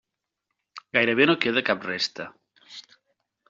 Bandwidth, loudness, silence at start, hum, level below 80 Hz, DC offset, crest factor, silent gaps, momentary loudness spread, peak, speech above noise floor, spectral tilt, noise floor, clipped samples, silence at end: 7.6 kHz; -23 LUFS; 0.75 s; none; -68 dBFS; under 0.1%; 22 dB; none; 24 LU; -4 dBFS; 58 dB; -2 dB/octave; -82 dBFS; under 0.1%; 0.7 s